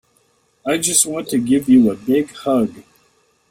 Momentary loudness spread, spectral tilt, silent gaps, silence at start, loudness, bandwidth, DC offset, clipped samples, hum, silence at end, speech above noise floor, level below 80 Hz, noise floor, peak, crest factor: 8 LU; -3.5 dB/octave; none; 0.65 s; -16 LUFS; 16.5 kHz; under 0.1%; under 0.1%; none; 0.7 s; 44 dB; -56 dBFS; -60 dBFS; 0 dBFS; 18 dB